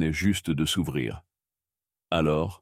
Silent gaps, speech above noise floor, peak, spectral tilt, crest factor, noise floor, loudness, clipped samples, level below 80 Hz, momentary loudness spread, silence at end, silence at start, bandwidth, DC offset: none; over 64 dB; -10 dBFS; -5 dB/octave; 18 dB; under -90 dBFS; -27 LUFS; under 0.1%; -48 dBFS; 8 LU; 0.05 s; 0 s; 16 kHz; under 0.1%